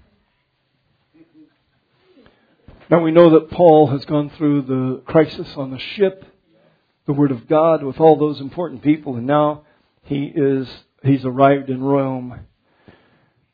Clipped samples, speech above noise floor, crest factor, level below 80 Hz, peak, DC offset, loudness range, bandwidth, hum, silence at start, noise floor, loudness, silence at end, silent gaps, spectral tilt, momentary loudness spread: under 0.1%; 51 dB; 18 dB; -54 dBFS; 0 dBFS; under 0.1%; 5 LU; 5 kHz; none; 2.9 s; -67 dBFS; -17 LUFS; 1.1 s; none; -10.5 dB/octave; 15 LU